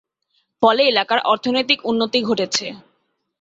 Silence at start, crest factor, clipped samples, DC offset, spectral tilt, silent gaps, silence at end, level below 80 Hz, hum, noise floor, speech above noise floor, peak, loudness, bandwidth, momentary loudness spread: 0.6 s; 18 dB; under 0.1%; under 0.1%; -3 dB/octave; none; 0.65 s; -64 dBFS; none; -68 dBFS; 50 dB; -2 dBFS; -18 LUFS; 8 kHz; 6 LU